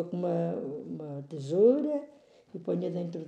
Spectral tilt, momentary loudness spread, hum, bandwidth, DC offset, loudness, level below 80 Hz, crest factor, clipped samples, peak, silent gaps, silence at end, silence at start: -9 dB/octave; 16 LU; none; 8.8 kHz; under 0.1%; -30 LUFS; -84 dBFS; 18 dB; under 0.1%; -12 dBFS; none; 0 s; 0 s